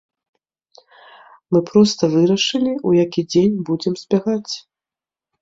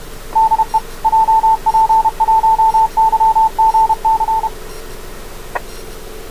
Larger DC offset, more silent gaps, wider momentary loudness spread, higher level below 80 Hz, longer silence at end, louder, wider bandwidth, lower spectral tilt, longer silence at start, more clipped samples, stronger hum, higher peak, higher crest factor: second, under 0.1% vs 1%; neither; second, 8 LU vs 20 LU; second, -58 dBFS vs -34 dBFS; first, 0.8 s vs 0 s; second, -17 LUFS vs -13 LUFS; second, 7.8 kHz vs 16 kHz; first, -5.5 dB/octave vs -3.5 dB/octave; first, 1.5 s vs 0 s; neither; neither; about the same, -2 dBFS vs -4 dBFS; first, 18 dB vs 10 dB